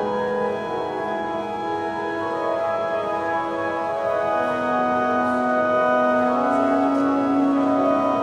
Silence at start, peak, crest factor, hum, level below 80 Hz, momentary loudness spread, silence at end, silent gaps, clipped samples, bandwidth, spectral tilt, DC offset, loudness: 0 s; -8 dBFS; 14 dB; none; -58 dBFS; 7 LU; 0 s; none; under 0.1%; 10 kHz; -6.5 dB/octave; under 0.1%; -22 LUFS